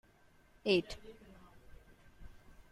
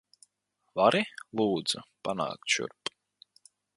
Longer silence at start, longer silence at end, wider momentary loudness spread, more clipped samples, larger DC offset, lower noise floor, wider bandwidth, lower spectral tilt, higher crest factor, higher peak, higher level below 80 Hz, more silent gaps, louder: about the same, 0.65 s vs 0.75 s; second, 0.4 s vs 1.1 s; first, 27 LU vs 13 LU; neither; neither; second, -66 dBFS vs -78 dBFS; first, 13.5 kHz vs 11.5 kHz; first, -5.5 dB/octave vs -3.5 dB/octave; about the same, 24 dB vs 24 dB; second, -16 dBFS vs -8 dBFS; first, -60 dBFS vs -72 dBFS; neither; second, -35 LUFS vs -30 LUFS